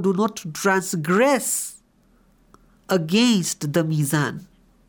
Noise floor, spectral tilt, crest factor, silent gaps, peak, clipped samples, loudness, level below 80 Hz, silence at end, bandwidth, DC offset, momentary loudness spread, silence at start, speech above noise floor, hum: -58 dBFS; -4.5 dB/octave; 16 dB; none; -6 dBFS; under 0.1%; -21 LUFS; -62 dBFS; 0.45 s; over 20 kHz; under 0.1%; 7 LU; 0 s; 38 dB; none